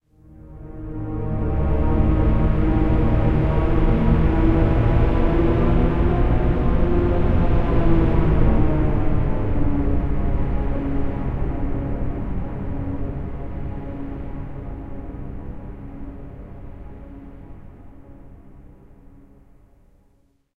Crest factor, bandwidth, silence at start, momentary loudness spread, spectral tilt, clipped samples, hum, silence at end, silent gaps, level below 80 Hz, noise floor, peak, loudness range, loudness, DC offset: 16 dB; 4.3 kHz; 0.35 s; 18 LU; -10.5 dB/octave; under 0.1%; none; 1.4 s; none; -24 dBFS; -60 dBFS; -4 dBFS; 18 LU; -22 LUFS; 0.3%